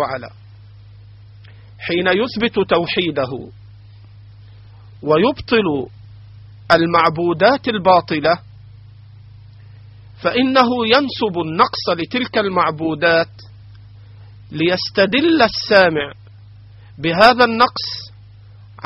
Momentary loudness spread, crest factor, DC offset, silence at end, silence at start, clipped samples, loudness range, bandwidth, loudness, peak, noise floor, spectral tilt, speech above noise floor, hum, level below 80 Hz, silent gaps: 13 LU; 18 dB; under 0.1%; 0 s; 0 s; under 0.1%; 5 LU; 6.2 kHz; -16 LUFS; 0 dBFS; -41 dBFS; -2.5 dB/octave; 25 dB; none; -50 dBFS; none